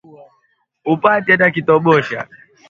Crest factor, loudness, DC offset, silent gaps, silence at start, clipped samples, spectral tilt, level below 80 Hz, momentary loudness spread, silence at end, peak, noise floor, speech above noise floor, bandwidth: 16 dB; -14 LUFS; under 0.1%; none; 0.85 s; under 0.1%; -7.5 dB/octave; -58 dBFS; 15 LU; 0.45 s; 0 dBFS; -63 dBFS; 49 dB; 7.2 kHz